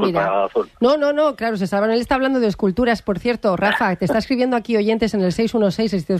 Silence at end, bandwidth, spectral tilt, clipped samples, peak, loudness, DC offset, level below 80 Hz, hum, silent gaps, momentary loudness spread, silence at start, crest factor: 0 s; 13.5 kHz; -6.5 dB/octave; under 0.1%; -4 dBFS; -19 LUFS; under 0.1%; -44 dBFS; none; none; 3 LU; 0 s; 14 dB